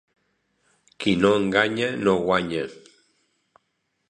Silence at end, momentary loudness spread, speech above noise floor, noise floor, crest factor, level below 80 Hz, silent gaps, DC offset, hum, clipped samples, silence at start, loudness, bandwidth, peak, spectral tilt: 1.35 s; 10 LU; 53 dB; -74 dBFS; 22 dB; -56 dBFS; none; under 0.1%; none; under 0.1%; 1 s; -22 LUFS; 10.5 kHz; -2 dBFS; -5.5 dB/octave